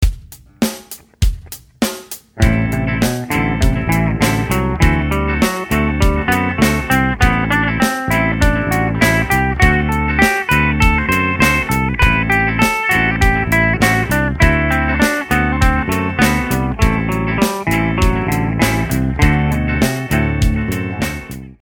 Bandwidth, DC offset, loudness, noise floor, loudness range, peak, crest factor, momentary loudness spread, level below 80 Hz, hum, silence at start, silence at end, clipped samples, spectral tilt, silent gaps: 18.5 kHz; under 0.1%; -15 LUFS; -36 dBFS; 3 LU; 0 dBFS; 14 dB; 8 LU; -22 dBFS; none; 0 s; 0.1 s; under 0.1%; -5.5 dB/octave; none